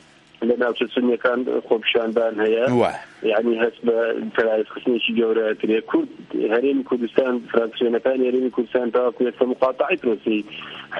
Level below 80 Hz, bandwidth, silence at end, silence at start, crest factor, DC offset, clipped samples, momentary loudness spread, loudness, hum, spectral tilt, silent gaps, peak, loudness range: -66 dBFS; 9 kHz; 0 s; 0.4 s; 20 dB; under 0.1%; under 0.1%; 4 LU; -21 LUFS; none; -6.5 dB/octave; none; 0 dBFS; 1 LU